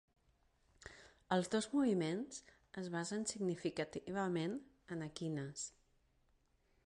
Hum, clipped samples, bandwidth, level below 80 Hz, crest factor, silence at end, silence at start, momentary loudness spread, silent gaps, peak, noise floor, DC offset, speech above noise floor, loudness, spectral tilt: none; under 0.1%; 11.5 kHz; -74 dBFS; 22 dB; 1.15 s; 0.85 s; 18 LU; none; -20 dBFS; -76 dBFS; under 0.1%; 36 dB; -41 LUFS; -5 dB/octave